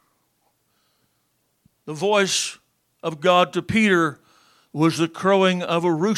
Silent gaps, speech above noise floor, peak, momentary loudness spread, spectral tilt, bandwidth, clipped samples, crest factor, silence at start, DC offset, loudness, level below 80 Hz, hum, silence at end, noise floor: none; 49 dB; -4 dBFS; 12 LU; -4.5 dB/octave; 15 kHz; under 0.1%; 18 dB; 1.85 s; under 0.1%; -20 LUFS; -62 dBFS; none; 0 s; -69 dBFS